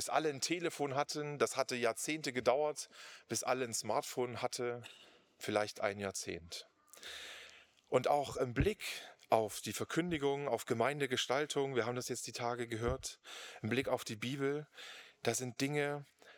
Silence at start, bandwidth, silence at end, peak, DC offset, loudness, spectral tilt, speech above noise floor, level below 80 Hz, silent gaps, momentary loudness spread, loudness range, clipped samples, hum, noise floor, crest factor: 0 s; over 20 kHz; 0 s; -14 dBFS; under 0.1%; -37 LUFS; -4 dB/octave; 23 dB; -60 dBFS; none; 13 LU; 4 LU; under 0.1%; none; -60 dBFS; 24 dB